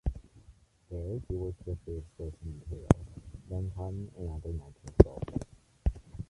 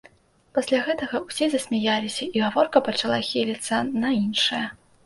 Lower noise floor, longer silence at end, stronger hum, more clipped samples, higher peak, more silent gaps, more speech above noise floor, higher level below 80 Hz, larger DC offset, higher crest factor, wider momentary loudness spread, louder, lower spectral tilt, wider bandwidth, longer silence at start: about the same, -59 dBFS vs -56 dBFS; second, 0.05 s vs 0.3 s; neither; neither; about the same, -2 dBFS vs -4 dBFS; neither; second, 28 dB vs 32 dB; first, -40 dBFS vs -62 dBFS; neither; first, 30 dB vs 20 dB; first, 19 LU vs 7 LU; second, -34 LUFS vs -24 LUFS; first, -9 dB/octave vs -4 dB/octave; about the same, 11.5 kHz vs 11.5 kHz; second, 0.05 s vs 0.55 s